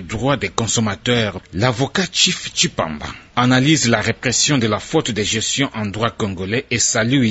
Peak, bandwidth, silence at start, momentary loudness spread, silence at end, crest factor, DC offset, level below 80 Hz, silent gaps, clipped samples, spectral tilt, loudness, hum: 0 dBFS; 8.2 kHz; 0 s; 7 LU; 0 s; 18 dB; under 0.1%; -46 dBFS; none; under 0.1%; -3.5 dB/octave; -17 LUFS; none